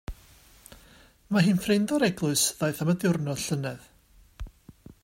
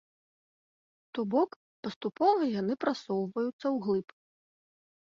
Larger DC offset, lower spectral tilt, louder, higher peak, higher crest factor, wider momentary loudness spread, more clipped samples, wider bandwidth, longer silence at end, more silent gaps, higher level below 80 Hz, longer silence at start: neither; second, -4.5 dB/octave vs -7 dB/octave; first, -26 LUFS vs -31 LUFS; first, -10 dBFS vs -14 dBFS; about the same, 18 dB vs 20 dB; first, 22 LU vs 10 LU; neither; first, 16 kHz vs 7.4 kHz; second, 0.35 s vs 1.05 s; second, none vs 1.56-1.83 s, 1.96-2.01 s, 3.53-3.59 s; first, -50 dBFS vs -76 dBFS; second, 0.1 s vs 1.15 s